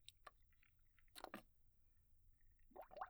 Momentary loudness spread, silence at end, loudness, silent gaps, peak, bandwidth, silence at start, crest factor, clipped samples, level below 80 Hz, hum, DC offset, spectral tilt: 9 LU; 0 s; -61 LUFS; none; -36 dBFS; over 20 kHz; 0 s; 26 dB; under 0.1%; -74 dBFS; none; under 0.1%; -3.5 dB/octave